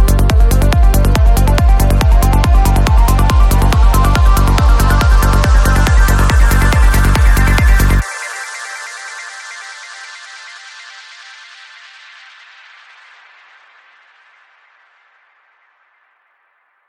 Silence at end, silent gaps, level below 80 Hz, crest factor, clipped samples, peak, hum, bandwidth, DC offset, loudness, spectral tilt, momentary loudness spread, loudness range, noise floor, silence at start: 6.1 s; none; -12 dBFS; 12 dB; under 0.1%; 0 dBFS; none; 15.5 kHz; under 0.1%; -12 LUFS; -5.5 dB/octave; 20 LU; 20 LU; -59 dBFS; 0 s